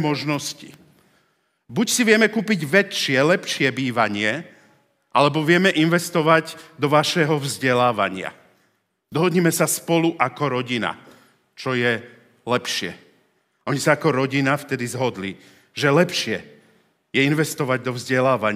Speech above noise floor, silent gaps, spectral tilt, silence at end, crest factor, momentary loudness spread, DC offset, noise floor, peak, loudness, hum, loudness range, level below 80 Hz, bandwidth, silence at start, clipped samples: 47 dB; none; -4.5 dB/octave; 0 s; 20 dB; 13 LU; under 0.1%; -67 dBFS; 0 dBFS; -20 LUFS; none; 4 LU; -72 dBFS; 16 kHz; 0 s; under 0.1%